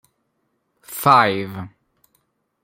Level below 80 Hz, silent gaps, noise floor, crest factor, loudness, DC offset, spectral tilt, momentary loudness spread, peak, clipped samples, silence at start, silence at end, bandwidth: -62 dBFS; none; -71 dBFS; 20 dB; -16 LUFS; under 0.1%; -4.5 dB/octave; 21 LU; -2 dBFS; under 0.1%; 0.9 s; 0.95 s; 16.5 kHz